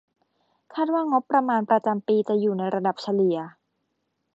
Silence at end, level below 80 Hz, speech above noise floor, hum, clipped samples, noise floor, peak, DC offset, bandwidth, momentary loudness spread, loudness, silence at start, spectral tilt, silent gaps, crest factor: 0.85 s; -78 dBFS; 53 dB; none; under 0.1%; -76 dBFS; -6 dBFS; under 0.1%; 7.8 kHz; 7 LU; -24 LUFS; 0.7 s; -8 dB/octave; none; 18 dB